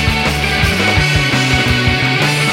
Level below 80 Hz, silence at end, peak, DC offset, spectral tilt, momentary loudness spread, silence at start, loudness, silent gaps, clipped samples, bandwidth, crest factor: -24 dBFS; 0 s; -2 dBFS; under 0.1%; -4 dB/octave; 2 LU; 0 s; -12 LUFS; none; under 0.1%; 16.5 kHz; 12 dB